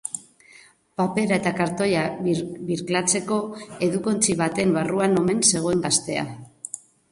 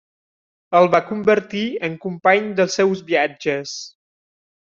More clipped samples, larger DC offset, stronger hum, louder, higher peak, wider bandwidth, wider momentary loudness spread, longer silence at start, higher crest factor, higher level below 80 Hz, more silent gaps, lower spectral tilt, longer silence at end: neither; neither; neither; second, -22 LUFS vs -19 LUFS; second, -6 dBFS vs -2 dBFS; first, 11.5 kHz vs 7.6 kHz; first, 16 LU vs 10 LU; second, 0.05 s vs 0.7 s; about the same, 18 dB vs 18 dB; first, -58 dBFS vs -64 dBFS; neither; about the same, -4 dB/octave vs -4.5 dB/octave; second, 0.35 s vs 0.75 s